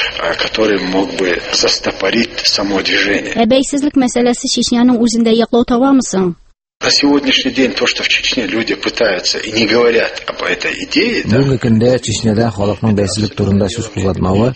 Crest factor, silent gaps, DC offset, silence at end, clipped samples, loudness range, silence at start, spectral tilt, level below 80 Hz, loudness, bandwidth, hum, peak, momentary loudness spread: 14 dB; 6.76-6.80 s; under 0.1%; 0 s; under 0.1%; 2 LU; 0 s; -4 dB/octave; -40 dBFS; -13 LUFS; 8.8 kHz; none; 0 dBFS; 5 LU